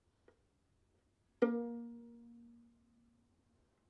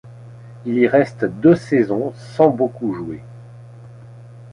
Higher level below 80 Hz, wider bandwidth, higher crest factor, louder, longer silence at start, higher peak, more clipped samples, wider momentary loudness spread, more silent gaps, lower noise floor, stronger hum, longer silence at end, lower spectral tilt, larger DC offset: second, -82 dBFS vs -56 dBFS; second, 6.2 kHz vs 10 kHz; first, 28 dB vs 18 dB; second, -39 LUFS vs -18 LUFS; first, 1.4 s vs 0.05 s; second, -18 dBFS vs -2 dBFS; neither; first, 23 LU vs 17 LU; neither; first, -77 dBFS vs -39 dBFS; neither; first, 1.3 s vs 0 s; about the same, -8 dB/octave vs -8.5 dB/octave; neither